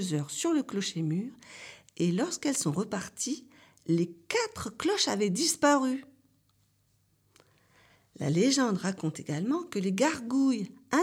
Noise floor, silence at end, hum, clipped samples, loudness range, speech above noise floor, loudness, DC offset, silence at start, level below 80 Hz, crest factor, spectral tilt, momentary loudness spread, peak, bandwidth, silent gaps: -70 dBFS; 0 s; none; under 0.1%; 3 LU; 41 dB; -29 LUFS; under 0.1%; 0 s; -70 dBFS; 20 dB; -4.5 dB/octave; 10 LU; -12 dBFS; 16.5 kHz; none